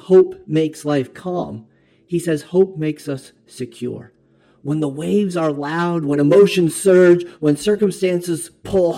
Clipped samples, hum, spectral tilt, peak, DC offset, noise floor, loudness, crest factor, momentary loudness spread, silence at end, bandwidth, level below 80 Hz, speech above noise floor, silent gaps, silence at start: under 0.1%; none; -6.5 dB/octave; -2 dBFS; under 0.1%; -55 dBFS; -18 LUFS; 16 dB; 17 LU; 0 s; 14 kHz; -54 dBFS; 38 dB; none; 0.1 s